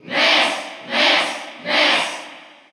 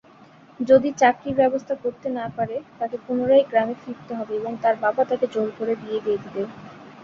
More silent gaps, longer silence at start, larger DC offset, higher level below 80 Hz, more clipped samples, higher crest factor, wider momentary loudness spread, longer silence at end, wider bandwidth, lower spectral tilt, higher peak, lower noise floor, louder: neither; second, 0.05 s vs 0.6 s; neither; second, -84 dBFS vs -64 dBFS; neither; about the same, 16 dB vs 20 dB; about the same, 14 LU vs 14 LU; first, 0.25 s vs 0 s; first, over 20 kHz vs 7.4 kHz; second, -1 dB/octave vs -6 dB/octave; about the same, -4 dBFS vs -2 dBFS; second, -40 dBFS vs -50 dBFS; first, -16 LUFS vs -23 LUFS